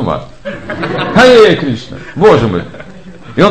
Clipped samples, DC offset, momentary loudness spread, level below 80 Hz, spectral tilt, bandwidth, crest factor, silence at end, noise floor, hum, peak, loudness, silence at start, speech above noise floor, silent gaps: 2%; 2%; 20 LU; -36 dBFS; -6 dB/octave; 9.6 kHz; 10 dB; 0 s; -32 dBFS; none; 0 dBFS; -9 LUFS; 0 s; 22 dB; none